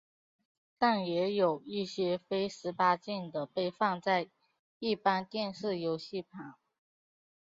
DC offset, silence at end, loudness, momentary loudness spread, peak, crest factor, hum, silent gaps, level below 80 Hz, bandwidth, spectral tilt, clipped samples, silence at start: under 0.1%; 0.9 s; -33 LUFS; 10 LU; -14 dBFS; 20 dB; none; 4.59-4.80 s; -76 dBFS; 7.6 kHz; -3.5 dB/octave; under 0.1%; 0.8 s